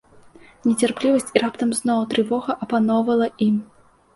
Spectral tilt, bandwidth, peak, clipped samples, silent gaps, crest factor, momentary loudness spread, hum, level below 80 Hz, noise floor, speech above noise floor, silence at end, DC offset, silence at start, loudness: -5 dB/octave; 11.5 kHz; 0 dBFS; under 0.1%; none; 20 dB; 4 LU; none; -62 dBFS; -48 dBFS; 28 dB; 0.5 s; under 0.1%; 0.65 s; -21 LUFS